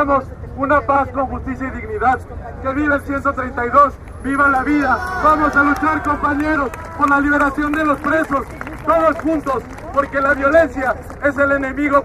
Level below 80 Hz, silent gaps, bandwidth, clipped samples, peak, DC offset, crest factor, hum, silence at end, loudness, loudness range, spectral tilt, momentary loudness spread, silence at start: -34 dBFS; none; 13.5 kHz; under 0.1%; 0 dBFS; under 0.1%; 16 dB; none; 0 s; -17 LUFS; 3 LU; -7 dB/octave; 10 LU; 0 s